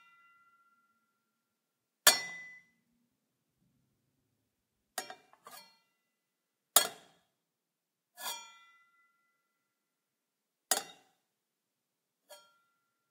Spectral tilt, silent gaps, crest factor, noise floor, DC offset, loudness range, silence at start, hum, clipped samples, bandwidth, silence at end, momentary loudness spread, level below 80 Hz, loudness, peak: 2 dB/octave; none; 36 dB; -88 dBFS; under 0.1%; 18 LU; 2.05 s; none; under 0.1%; 16 kHz; 0.75 s; 28 LU; under -90 dBFS; -30 LUFS; -6 dBFS